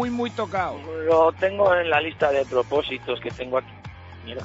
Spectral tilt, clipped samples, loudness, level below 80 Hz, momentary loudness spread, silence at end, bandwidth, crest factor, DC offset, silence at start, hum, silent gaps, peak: -5.5 dB/octave; under 0.1%; -23 LUFS; -52 dBFS; 18 LU; 0 s; 8 kHz; 16 dB; under 0.1%; 0 s; none; none; -6 dBFS